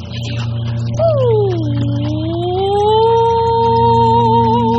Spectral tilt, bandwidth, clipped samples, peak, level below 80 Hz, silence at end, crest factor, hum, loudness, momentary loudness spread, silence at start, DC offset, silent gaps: -8 dB/octave; 7.8 kHz; under 0.1%; 0 dBFS; -38 dBFS; 0 s; 12 dB; none; -14 LUFS; 9 LU; 0 s; under 0.1%; none